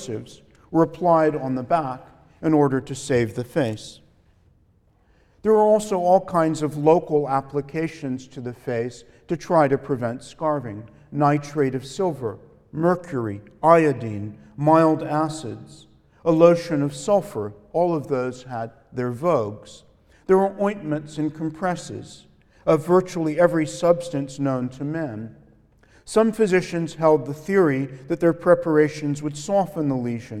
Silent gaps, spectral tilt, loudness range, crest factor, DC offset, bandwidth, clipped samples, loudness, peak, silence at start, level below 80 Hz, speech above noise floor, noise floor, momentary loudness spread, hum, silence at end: none; -7 dB/octave; 4 LU; 20 dB; under 0.1%; 14 kHz; under 0.1%; -22 LUFS; -2 dBFS; 0 s; -56 dBFS; 38 dB; -60 dBFS; 14 LU; none; 0 s